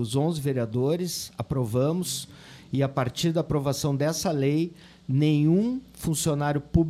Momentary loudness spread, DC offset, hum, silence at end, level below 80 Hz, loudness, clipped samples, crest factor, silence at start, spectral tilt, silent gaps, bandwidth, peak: 9 LU; under 0.1%; none; 0 s; -48 dBFS; -26 LUFS; under 0.1%; 18 dB; 0 s; -6 dB/octave; none; 15.5 kHz; -8 dBFS